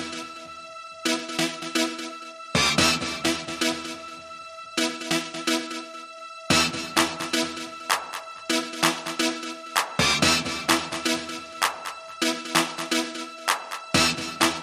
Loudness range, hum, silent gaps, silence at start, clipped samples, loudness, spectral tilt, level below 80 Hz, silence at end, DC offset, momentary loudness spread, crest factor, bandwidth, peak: 3 LU; none; none; 0 s; under 0.1%; -25 LUFS; -2 dB/octave; -54 dBFS; 0 s; under 0.1%; 16 LU; 22 dB; 15.5 kHz; -4 dBFS